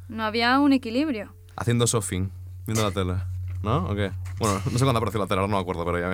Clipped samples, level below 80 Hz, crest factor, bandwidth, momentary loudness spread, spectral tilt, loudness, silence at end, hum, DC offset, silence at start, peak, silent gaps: under 0.1%; -48 dBFS; 16 dB; 16.5 kHz; 10 LU; -5 dB/octave; -25 LUFS; 0 s; none; under 0.1%; 0 s; -8 dBFS; none